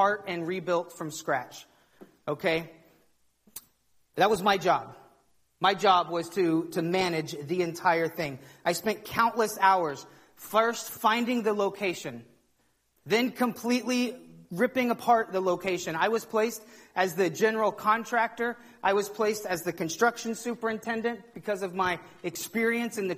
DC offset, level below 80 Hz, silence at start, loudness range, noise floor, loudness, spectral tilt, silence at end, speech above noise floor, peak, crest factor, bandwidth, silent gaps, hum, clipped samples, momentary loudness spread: under 0.1%; -70 dBFS; 0 s; 4 LU; -70 dBFS; -28 LUFS; -4 dB/octave; 0 s; 42 dB; -10 dBFS; 20 dB; 15.5 kHz; none; none; under 0.1%; 12 LU